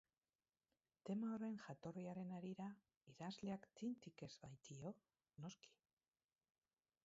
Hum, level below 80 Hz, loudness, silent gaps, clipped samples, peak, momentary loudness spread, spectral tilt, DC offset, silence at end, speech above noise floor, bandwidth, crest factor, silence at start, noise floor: none; -86 dBFS; -53 LUFS; 2.97-3.01 s; under 0.1%; -38 dBFS; 12 LU; -6.5 dB/octave; under 0.1%; 1.35 s; over 38 dB; 7.6 kHz; 16 dB; 1.05 s; under -90 dBFS